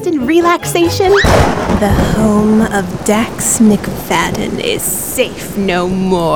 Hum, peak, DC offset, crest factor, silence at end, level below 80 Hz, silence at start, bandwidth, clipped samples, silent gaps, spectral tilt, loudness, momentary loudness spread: none; 0 dBFS; 1%; 12 dB; 0 s; -26 dBFS; 0 s; over 20 kHz; under 0.1%; none; -4.5 dB/octave; -12 LUFS; 6 LU